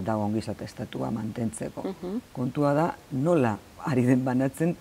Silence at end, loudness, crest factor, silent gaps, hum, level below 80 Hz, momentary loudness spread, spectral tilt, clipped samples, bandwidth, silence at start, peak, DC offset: 0 s; -28 LUFS; 18 dB; none; none; -58 dBFS; 11 LU; -7.5 dB/octave; under 0.1%; 16 kHz; 0 s; -8 dBFS; under 0.1%